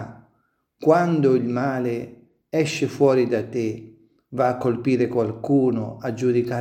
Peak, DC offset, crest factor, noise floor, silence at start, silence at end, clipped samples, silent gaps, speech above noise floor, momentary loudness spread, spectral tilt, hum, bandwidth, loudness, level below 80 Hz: -4 dBFS; under 0.1%; 18 dB; -68 dBFS; 0 s; 0 s; under 0.1%; none; 47 dB; 11 LU; -7 dB/octave; none; 14.5 kHz; -22 LUFS; -64 dBFS